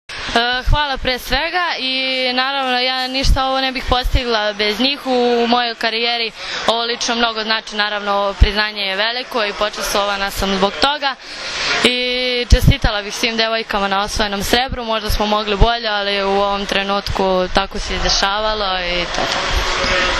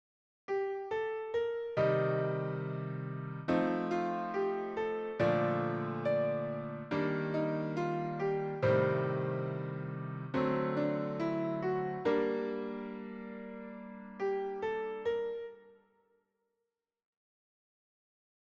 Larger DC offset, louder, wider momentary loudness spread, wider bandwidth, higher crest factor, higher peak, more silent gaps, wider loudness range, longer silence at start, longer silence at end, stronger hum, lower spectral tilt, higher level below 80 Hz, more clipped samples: neither; first, -17 LUFS vs -35 LUFS; second, 4 LU vs 10 LU; first, 14 kHz vs 7.2 kHz; about the same, 16 dB vs 18 dB; first, 0 dBFS vs -18 dBFS; neither; second, 1 LU vs 6 LU; second, 0.1 s vs 0.5 s; second, 0 s vs 2.8 s; neither; second, -3.5 dB/octave vs -8.5 dB/octave; first, -24 dBFS vs -70 dBFS; neither